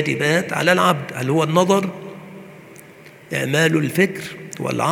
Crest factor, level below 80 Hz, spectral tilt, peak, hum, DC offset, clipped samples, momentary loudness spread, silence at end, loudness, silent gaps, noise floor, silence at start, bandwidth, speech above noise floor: 20 dB; -64 dBFS; -5 dB/octave; 0 dBFS; none; under 0.1%; under 0.1%; 19 LU; 0 s; -19 LUFS; none; -43 dBFS; 0 s; 19.5 kHz; 25 dB